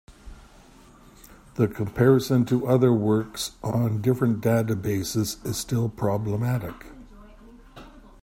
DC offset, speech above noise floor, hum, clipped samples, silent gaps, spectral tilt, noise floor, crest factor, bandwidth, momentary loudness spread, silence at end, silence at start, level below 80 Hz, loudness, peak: under 0.1%; 28 dB; none; under 0.1%; none; -6.5 dB/octave; -51 dBFS; 20 dB; 16.5 kHz; 10 LU; 0.25 s; 0.1 s; -50 dBFS; -24 LUFS; -6 dBFS